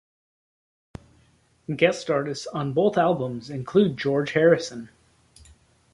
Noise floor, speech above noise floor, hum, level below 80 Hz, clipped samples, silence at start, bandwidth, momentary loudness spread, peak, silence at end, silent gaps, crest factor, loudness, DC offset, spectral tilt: -61 dBFS; 39 dB; none; -60 dBFS; under 0.1%; 1.7 s; 11.5 kHz; 14 LU; -4 dBFS; 1.05 s; none; 22 dB; -23 LUFS; under 0.1%; -6 dB/octave